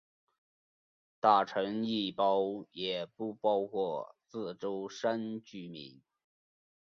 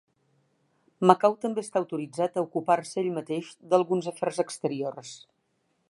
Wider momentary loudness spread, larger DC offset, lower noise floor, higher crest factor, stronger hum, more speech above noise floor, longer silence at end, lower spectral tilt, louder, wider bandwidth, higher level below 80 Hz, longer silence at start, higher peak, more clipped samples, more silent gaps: first, 17 LU vs 12 LU; neither; first, under -90 dBFS vs -74 dBFS; about the same, 24 dB vs 26 dB; neither; first, over 57 dB vs 47 dB; first, 1 s vs 0.75 s; about the same, -5.5 dB/octave vs -6 dB/octave; second, -33 LUFS vs -27 LUFS; second, 7.4 kHz vs 11.5 kHz; about the same, -80 dBFS vs -80 dBFS; first, 1.25 s vs 1 s; second, -10 dBFS vs -2 dBFS; neither; neither